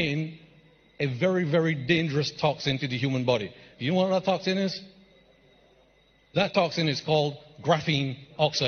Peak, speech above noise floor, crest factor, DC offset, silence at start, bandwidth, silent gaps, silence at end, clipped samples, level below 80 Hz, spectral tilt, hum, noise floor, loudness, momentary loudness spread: -6 dBFS; 36 dB; 20 dB; under 0.1%; 0 s; 6.6 kHz; none; 0 s; under 0.1%; -62 dBFS; -5.5 dB/octave; none; -62 dBFS; -27 LUFS; 8 LU